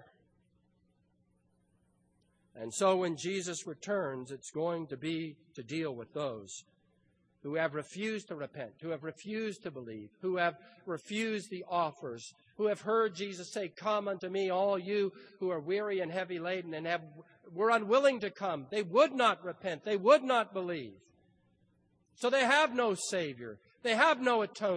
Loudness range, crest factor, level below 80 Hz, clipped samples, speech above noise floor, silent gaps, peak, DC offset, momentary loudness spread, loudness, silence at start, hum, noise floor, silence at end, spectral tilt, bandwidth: 8 LU; 22 dB; -82 dBFS; under 0.1%; 40 dB; none; -12 dBFS; under 0.1%; 17 LU; -33 LUFS; 2.55 s; none; -73 dBFS; 0 s; -4 dB/octave; 10.5 kHz